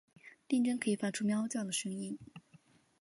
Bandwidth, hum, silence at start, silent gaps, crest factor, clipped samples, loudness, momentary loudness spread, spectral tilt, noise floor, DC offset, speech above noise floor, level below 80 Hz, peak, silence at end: 11.5 kHz; none; 0.25 s; none; 16 dB; under 0.1%; -35 LUFS; 12 LU; -4.5 dB/octave; -65 dBFS; under 0.1%; 31 dB; -80 dBFS; -20 dBFS; 0.65 s